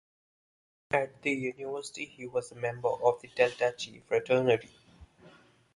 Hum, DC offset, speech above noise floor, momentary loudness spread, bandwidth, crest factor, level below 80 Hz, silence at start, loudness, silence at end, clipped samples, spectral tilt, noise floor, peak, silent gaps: none; under 0.1%; 28 dB; 11 LU; 11.5 kHz; 22 dB; -68 dBFS; 0.9 s; -31 LUFS; 0.45 s; under 0.1%; -5 dB/octave; -59 dBFS; -10 dBFS; none